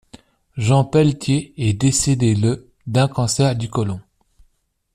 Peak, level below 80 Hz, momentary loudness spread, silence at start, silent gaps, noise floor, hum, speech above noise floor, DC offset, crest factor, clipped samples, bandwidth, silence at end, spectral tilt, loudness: -2 dBFS; -46 dBFS; 8 LU; 0.15 s; none; -64 dBFS; none; 47 dB; under 0.1%; 16 dB; under 0.1%; 14 kHz; 0.95 s; -5.5 dB/octave; -18 LUFS